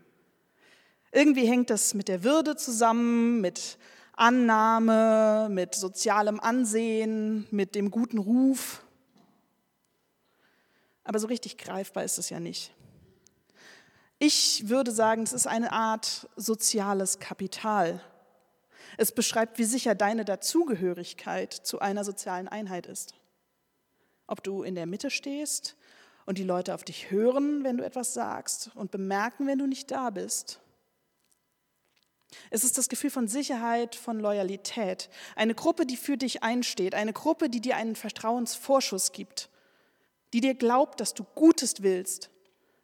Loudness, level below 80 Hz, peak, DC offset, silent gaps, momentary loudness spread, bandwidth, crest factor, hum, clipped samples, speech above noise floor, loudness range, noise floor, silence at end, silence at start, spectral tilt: -27 LUFS; -82 dBFS; -6 dBFS; under 0.1%; none; 14 LU; 18 kHz; 22 dB; none; under 0.1%; 49 dB; 11 LU; -76 dBFS; 0.55 s; 1.1 s; -3 dB/octave